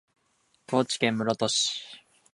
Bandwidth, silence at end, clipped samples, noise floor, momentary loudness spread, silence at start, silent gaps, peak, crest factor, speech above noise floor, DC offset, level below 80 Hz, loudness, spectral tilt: 11.5 kHz; 0.35 s; under 0.1%; -70 dBFS; 9 LU; 0.7 s; none; -8 dBFS; 22 dB; 43 dB; under 0.1%; -72 dBFS; -27 LUFS; -3 dB/octave